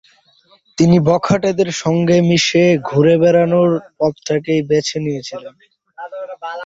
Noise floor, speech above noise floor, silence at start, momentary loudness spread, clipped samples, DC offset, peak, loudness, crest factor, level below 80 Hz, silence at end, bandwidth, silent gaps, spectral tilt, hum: -52 dBFS; 38 dB; 0.8 s; 17 LU; under 0.1%; under 0.1%; -2 dBFS; -14 LUFS; 14 dB; -52 dBFS; 0 s; 7.8 kHz; none; -6 dB/octave; none